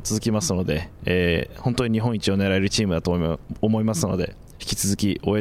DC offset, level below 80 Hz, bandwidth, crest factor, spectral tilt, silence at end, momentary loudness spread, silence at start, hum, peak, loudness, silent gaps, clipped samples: under 0.1%; -42 dBFS; 16 kHz; 16 dB; -5 dB/octave; 0 s; 6 LU; 0 s; none; -6 dBFS; -23 LUFS; none; under 0.1%